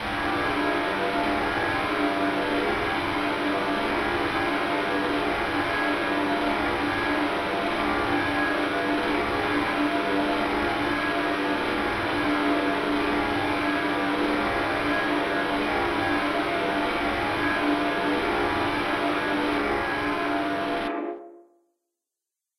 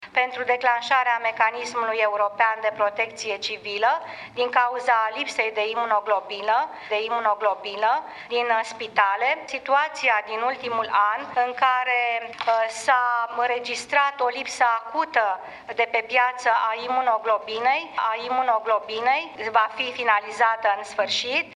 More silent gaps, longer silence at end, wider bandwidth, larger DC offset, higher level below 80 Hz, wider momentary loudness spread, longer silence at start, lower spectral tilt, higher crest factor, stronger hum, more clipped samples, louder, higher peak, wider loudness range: neither; first, 1.15 s vs 0 s; first, 13.5 kHz vs 11.5 kHz; neither; first, -48 dBFS vs -72 dBFS; second, 1 LU vs 5 LU; about the same, 0 s vs 0 s; first, -5 dB/octave vs -1 dB/octave; second, 14 dB vs 20 dB; neither; neither; about the same, -25 LUFS vs -23 LUFS; second, -12 dBFS vs -4 dBFS; about the same, 1 LU vs 1 LU